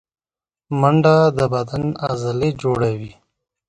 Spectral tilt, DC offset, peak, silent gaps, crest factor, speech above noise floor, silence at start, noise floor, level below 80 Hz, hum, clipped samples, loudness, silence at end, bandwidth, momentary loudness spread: -7.5 dB/octave; under 0.1%; 0 dBFS; none; 18 dB; over 73 dB; 0.7 s; under -90 dBFS; -48 dBFS; none; under 0.1%; -18 LUFS; 0.6 s; 10.5 kHz; 11 LU